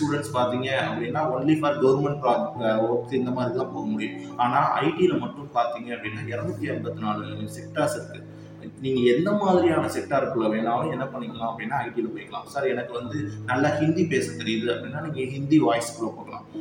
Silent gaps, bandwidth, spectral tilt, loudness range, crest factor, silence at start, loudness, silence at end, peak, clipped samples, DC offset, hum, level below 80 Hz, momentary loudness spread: none; 16.5 kHz; -6 dB/octave; 4 LU; 18 dB; 0 s; -25 LUFS; 0 s; -8 dBFS; under 0.1%; under 0.1%; none; -62 dBFS; 11 LU